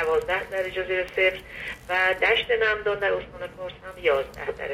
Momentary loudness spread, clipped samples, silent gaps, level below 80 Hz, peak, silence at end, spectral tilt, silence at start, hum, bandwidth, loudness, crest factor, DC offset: 14 LU; under 0.1%; none; -50 dBFS; -8 dBFS; 0 s; -4 dB/octave; 0 s; none; 15.5 kHz; -24 LUFS; 18 dB; under 0.1%